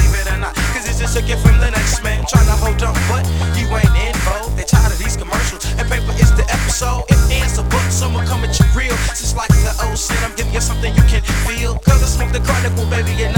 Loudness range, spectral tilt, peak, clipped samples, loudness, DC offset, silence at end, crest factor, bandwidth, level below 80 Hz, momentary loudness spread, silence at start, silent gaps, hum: 1 LU; -4.5 dB/octave; 0 dBFS; under 0.1%; -16 LUFS; under 0.1%; 0 s; 14 dB; 18.5 kHz; -16 dBFS; 5 LU; 0 s; none; none